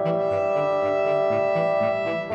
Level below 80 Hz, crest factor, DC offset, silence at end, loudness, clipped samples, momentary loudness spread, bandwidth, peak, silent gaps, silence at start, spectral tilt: -64 dBFS; 12 dB; under 0.1%; 0 s; -23 LUFS; under 0.1%; 1 LU; 7.6 kHz; -12 dBFS; none; 0 s; -7 dB/octave